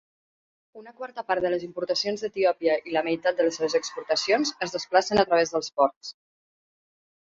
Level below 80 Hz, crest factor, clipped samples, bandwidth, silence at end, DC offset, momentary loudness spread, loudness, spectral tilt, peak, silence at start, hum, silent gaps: -64 dBFS; 20 dB; under 0.1%; 7.8 kHz; 1.25 s; under 0.1%; 9 LU; -25 LUFS; -3 dB/octave; -6 dBFS; 0.75 s; none; 5.96-6.01 s